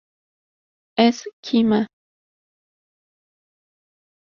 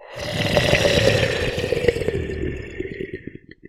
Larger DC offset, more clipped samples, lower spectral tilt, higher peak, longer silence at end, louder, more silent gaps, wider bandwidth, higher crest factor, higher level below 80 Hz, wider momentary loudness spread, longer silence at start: neither; neither; about the same, -5.5 dB/octave vs -4.5 dB/octave; about the same, -2 dBFS vs 0 dBFS; first, 2.45 s vs 0.3 s; about the same, -20 LUFS vs -21 LUFS; first, 1.33-1.43 s vs none; second, 7.2 kHz vs 16.5 kHz; about the same, 24 dB vs 22 dB; second, -66 dBFS vs -36 dBFS; second, 12 LU vs 15 LU; first, 0.95 s vs 0 s